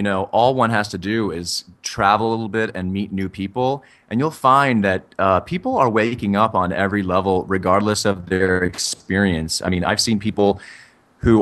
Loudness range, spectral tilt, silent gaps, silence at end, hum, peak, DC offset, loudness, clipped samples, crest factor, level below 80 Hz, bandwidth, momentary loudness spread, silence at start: 3 LU; -5 dB/octave; none; 0 s; none; -2 dBFS; under 0.1%; -19 LUFS; under 0.1%; 18 dB; -44 dBFS; 13 kHz; 8 LU; 0 s